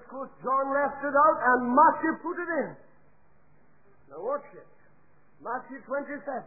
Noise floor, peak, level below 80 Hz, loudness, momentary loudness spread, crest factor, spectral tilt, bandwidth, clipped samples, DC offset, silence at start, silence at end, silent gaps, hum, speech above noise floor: -64 dBFS; -10 dBFS; -70 dBFS; -26 LUFS; 16 LU; 20 dB; -11.5 dB/octave; 2.6 kHz; under 0.1%; 0.2%; 0.1 s; 0 s; none; none; 37 dB